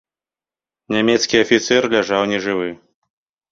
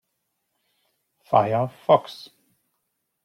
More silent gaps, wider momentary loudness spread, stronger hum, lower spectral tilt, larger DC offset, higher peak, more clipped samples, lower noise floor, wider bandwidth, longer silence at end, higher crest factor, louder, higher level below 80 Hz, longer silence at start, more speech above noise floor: neither; second, 8 LU vs 18 LU; neither; second, -3.5 dB/octave vs -7 dB/octave; neither; about the same, -2 dBFS vs -4 dBFS; neither; first, under -90 dBFS vs -77 dBFS; second, 7.8 kHz vs 13.5 kHz; second, 0.75 s vs 1.1 s; about the same, 18 dB vs 22 dB; first, -17 LUFS vs -21 LUFS; first, -56 dBFS vs -68 dBFS; second, 0.9 s vs 1.3 s; first, over 73 dB vs 56 dB